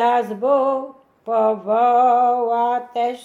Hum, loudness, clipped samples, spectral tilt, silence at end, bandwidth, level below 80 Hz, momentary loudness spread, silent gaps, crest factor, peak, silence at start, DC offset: none; -18 LUFS; under 0.1%; -6 dB/octave; 0 s; 7.4 kHz; -74 dBFS; 9 LU; none; 12 dB; -6 dBFS; 0 s; under 0.1%